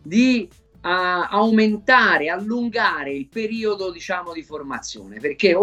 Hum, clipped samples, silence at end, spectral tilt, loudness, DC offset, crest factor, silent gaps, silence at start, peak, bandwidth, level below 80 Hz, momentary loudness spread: none; under 0.1%; 0 s; -4.5 dB/octave; -20 LUFS; under 0.1%; 18 dB; none; 0.05 s; -2 dBFS; 8.2 kHz; -56 dBFS; 16 LU